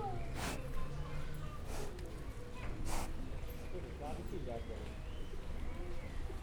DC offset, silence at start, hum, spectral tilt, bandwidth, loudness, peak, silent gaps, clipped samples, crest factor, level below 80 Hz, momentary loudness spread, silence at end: under 0.1%; 0 s; none; -5.5 dB/octave; 18.5 kHz; -46 LUFS; -24 dBFS; none; under 0.1%; 16 dB; -44 dBFS; 6 LU; 0 s